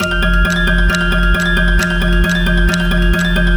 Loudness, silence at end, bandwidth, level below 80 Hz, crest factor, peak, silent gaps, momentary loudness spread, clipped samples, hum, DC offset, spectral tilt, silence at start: -14 LUFS; 0 s; over 20 kHz; -14 dBFS; 12 dB; 0 dBFS; none; 1 LU; under 0.1%; none; under 0.1%; -5 dB/octave; 0 s